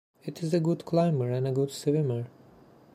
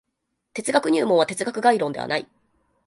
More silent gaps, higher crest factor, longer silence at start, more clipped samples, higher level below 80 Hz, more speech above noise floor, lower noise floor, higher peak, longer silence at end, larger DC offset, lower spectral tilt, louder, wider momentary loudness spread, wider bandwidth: neither; about the same, 16 dB vs 20 dB; second, 0.25 s vs 0.55 s; neither; about the same, -70 dBFS vs -68 dBFS; second, 28 dB vs 56 dB; second, -55 dBFS vs -78 dBFS; second, -12 dBFS vs -4 dBFS; about the same, 0.65 s vs 0.6 s; neither; first, -7.5 dB/octave vs -4 dB/octave; second, -28 LUFS vs -22 LUFS; about the same, 10 LU vs 9 LU; first, 13.5 kHz vs 11.5 kHz